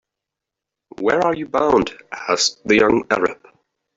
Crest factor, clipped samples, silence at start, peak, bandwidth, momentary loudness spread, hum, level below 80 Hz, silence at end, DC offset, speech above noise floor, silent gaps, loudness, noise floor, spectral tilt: 18 dB; under 0.1%; 1 s; -2 dBFS; 7.8 kHz; 9 LU; none; -52 dBFS; 0.6 s; under 0.1%; 66 dB; none; -18 LUFS; -84 dBFS; -3.5 dB/octave